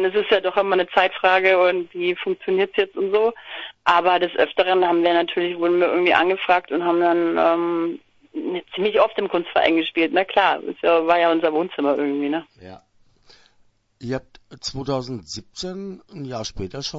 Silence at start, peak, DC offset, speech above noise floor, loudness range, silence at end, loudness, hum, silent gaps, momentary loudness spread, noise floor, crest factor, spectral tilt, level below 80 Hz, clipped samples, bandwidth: 0 s; 0 dBFS; under 0.1%; 39 dB; 12 LU; 0 s; -20 LUFS; none; none; 13 LU; -59 dBFS; 20 dB; -5 dB/octave; -54 dBFS; under 0.1%; 8 kHz